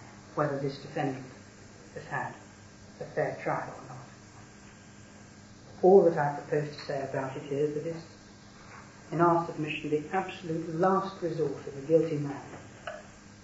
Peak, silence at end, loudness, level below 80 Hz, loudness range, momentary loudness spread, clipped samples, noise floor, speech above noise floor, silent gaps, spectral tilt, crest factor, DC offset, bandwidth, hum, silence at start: -6 dBFS; 0 s; -30 LUFS; -64 dBFS; 9 LU; 25 LU; under 0.1%; -51 dBFS; 22 dB; none; -7 dB/octave; 24 dB; under 0.1%; 8 kHz; none; 0 s